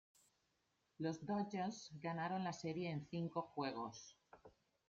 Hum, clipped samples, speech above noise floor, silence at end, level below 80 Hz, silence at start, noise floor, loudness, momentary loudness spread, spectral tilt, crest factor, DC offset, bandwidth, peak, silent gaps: none; under 0.1%; 40 dB; 0.4 s; -82 dBFS; 1 s; -84 dBFS; -45 LUFS; 8 LU; -6 dB/octave; 18 dB; under 0.1%; 8.6 kHz; -30 dBFS; none